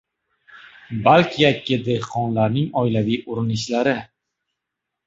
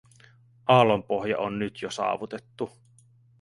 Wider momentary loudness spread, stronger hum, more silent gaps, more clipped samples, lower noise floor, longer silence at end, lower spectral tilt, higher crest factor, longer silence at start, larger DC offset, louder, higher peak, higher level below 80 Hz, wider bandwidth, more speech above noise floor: second, 8 LU vs 17 LU; neither; neither; neither; first, -82 dBFS vs -58 dBFS; first, 1.05 s vs 0.75 s; about the same, -6 dB/octave vs -6 dB/octave; about the same, 20 dB vs 22 dB; about the same, 0.55 s vs 0.65 s; neither; first, -20 LUFS vs -26 LUFS; about the same, -2 dBFS vs -4 dBFS; first, -54 dBFS vs -64 dBFS; second, 8 kHz vs 11.5 kHz; first, 63 dB vs 33 dB